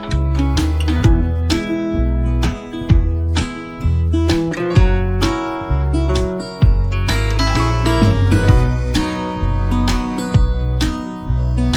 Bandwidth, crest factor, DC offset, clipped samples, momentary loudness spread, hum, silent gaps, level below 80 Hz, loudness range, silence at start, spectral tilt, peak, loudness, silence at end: 13.5 kHz; 14 dB; under 0.1%; under 0.1%; 6 LU; none; none; -18 dBFS; 2 LU; 0 s; -6.5 dB/octave; 0 dBFS; -17 LUFS; 0 s